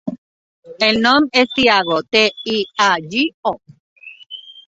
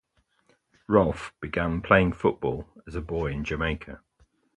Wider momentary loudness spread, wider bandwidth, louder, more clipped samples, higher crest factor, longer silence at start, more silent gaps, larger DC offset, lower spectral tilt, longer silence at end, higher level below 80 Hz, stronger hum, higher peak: about the same, 18 LU vs 16 LU; second, 8 kHz vs 11 kHz; first, -15 LUFS vs -26 LUFS; neither; second, 18 dB vs 24 dB; second, 0.05 s vs 0.9 s; first, 0.18-0.63 s, 3.34-3.43 s, 3.80-3.96 s vs none; neither; second, -3.5 dB/octave vs -7.5 dB/octave; second, 0.05 s vs 0.6 s; second, -54 dBFS vs -42 dBFS; neither; about the same, 0 dBFS vs -2 dBFS